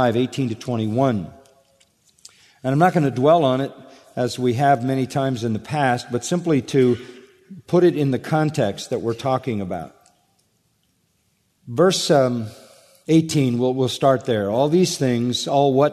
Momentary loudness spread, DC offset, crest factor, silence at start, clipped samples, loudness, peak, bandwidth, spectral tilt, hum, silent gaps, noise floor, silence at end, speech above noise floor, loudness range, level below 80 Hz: 10 LU; under 0.1%; 18 dB; 0 s; under 0.1%; -20 LUFS; -4 dBFS; 13.5 kHz; -6 dB/octave; none; none; -66 dBFS; 0 s; 47 dB; 4 LU; -62 dBFS